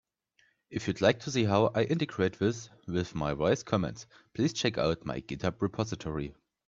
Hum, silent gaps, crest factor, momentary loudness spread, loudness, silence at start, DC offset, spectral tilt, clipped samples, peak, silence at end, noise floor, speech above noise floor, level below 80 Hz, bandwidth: none; none; 22 dB; 11 LU; -31 LUFS; 0.7 s; under 0.1%; -5.5 dB/octave; under 0.1%; -10 dBFS; 0.35 s; -70 dBFS; 40 dB; -56 dBFS; 7.8 kHz